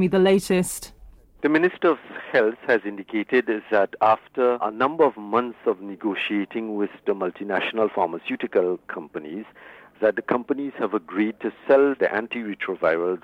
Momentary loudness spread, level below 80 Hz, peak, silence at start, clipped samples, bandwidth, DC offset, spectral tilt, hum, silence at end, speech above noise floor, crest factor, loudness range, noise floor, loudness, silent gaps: 9 LU; -60 dBFS; -6 dBFS; 0 s; under 0.1%; 16 kHz; under 0.1%; -5.5 dB/octave; none; 0.05 s; 25 dB; 16 dB; 4 LU; -48 dBFS; -23 LUFS; none